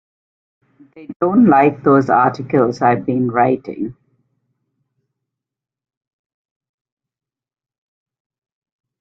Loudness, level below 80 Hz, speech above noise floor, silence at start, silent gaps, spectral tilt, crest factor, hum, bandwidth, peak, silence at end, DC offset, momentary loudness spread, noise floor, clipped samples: -14 LUFS; -60 dBFS; 71 dB; 0.95 s; 1.16-1.20 s; -9 dB/octave; 18 dB; none; 7.2 kHz; 0 dBFS; 5.1 s; under 0.1%; 15 LU; -86 dBFS; under 0.1%